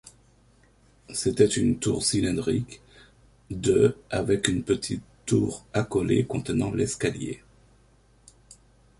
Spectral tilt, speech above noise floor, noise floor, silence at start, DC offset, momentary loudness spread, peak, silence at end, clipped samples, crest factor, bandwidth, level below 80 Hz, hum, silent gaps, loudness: -5 dB/octave; 34 dB; -59 dBFS; 1.1 s; under 0.1%; 13 LU; -4 dBFS; 1.6 s; under 0.1%; 22 dB; 11.5 kHz; -50 dBFS; none; none; -26 LUFS